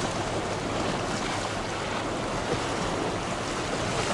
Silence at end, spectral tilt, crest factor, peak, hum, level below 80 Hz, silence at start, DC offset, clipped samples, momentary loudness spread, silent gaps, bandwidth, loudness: 0 s; -4 dB/octave; 16 dB; -14 dBFS; none; -46 dBFS; 0 s; under 0.1%; under 0.1%; 2 LU; none; 11.5 kHz; -29 LUFS